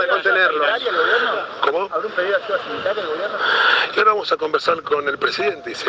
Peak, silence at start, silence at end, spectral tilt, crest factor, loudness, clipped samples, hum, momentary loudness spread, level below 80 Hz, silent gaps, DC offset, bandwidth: -4 dBFS; 0 s; 0 s; -3 dB/octave; 16 dB; -18 LUFS; under 0.1%; none; 8 LU; -66 dBFS; none; under 0.1%; 9 kHz